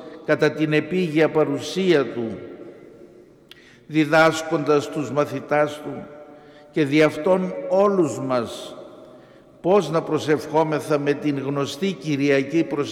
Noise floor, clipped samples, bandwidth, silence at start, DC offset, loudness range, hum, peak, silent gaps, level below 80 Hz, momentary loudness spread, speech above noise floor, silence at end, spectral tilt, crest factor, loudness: -49 dBFS; under 0.1%; 15.5 kHz; 0 s; under 0.1%; 2 LU; none; -4 dBFS; none; -64 dBFS; 13 LU; 28 dB; 0 s; -6 dB/octave; 18 dB; -21 LUFS